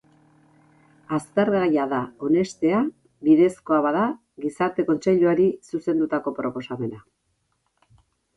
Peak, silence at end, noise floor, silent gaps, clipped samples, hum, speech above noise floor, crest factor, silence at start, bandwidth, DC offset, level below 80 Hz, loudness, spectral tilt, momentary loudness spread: -6 dBFS; 1.4 s; -72 dBFS; none; under 0.1%; none; 50 dB; 16 dB; 1.1 s; 11.5 kHz; under 0.1%; -64 dBFS; -23 LUFS; -7 dB/octave; 11 LU